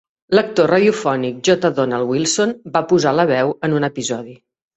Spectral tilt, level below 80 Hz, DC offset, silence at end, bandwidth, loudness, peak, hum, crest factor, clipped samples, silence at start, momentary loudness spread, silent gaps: -4.5 dB/octave; -58 dBFS; under 0.1%; 0.4 s; 8.2 kHz; -17 LUFS; -2 dBFS; none; 16 dB; under 0.1%; 0.3 s; 7 LU; none